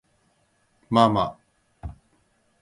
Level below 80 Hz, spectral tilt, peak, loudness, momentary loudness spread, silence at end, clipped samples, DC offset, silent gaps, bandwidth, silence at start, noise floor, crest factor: -50 dBFS; -7 dB/octave; -2 dBFS; -22 LUFS; 23 LU; 0.7 s; under 0.1%; under 0.1%; none; 11.5 kHz; 0.9 s; -67 dBFS; 24 dB